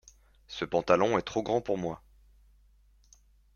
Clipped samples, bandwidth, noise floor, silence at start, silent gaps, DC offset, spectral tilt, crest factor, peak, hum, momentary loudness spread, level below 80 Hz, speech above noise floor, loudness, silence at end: under 0.1%; 7.2 kHz; -62 dBFS; 0.5 s; none; under 0.1%; -5.5 dB/octave; 24 dB; -8 dBFS; none; 15 LU; -60 dBFS; 34 dB; -29 LUFS; 1.6 s